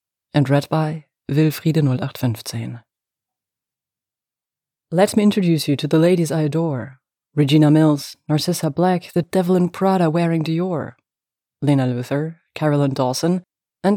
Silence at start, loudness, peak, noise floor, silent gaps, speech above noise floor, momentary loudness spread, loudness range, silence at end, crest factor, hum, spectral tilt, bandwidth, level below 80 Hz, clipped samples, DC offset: 0.35 s; -19 LUFS; -2 dBFS; -89 dBFS; none; 71 dB; 11 LU; 6 LU; 0 s; 18 dB; none; -7 dB/octave; 17.5 kHz; -64 dBFS; under 0.1%; under 0.1%